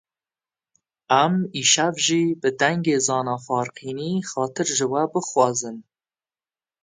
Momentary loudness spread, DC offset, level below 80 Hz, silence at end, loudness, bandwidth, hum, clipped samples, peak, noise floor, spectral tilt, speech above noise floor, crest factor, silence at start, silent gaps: 9 LU; under 0.1%; -70 dBFS; 1 s; -21 LUFS; 9.8 kHz; none; under 0.1%; -2 dBFS; under -90 dBFS; -3 dB/octave; over 68 dB; 20 dB; 1.1 s; none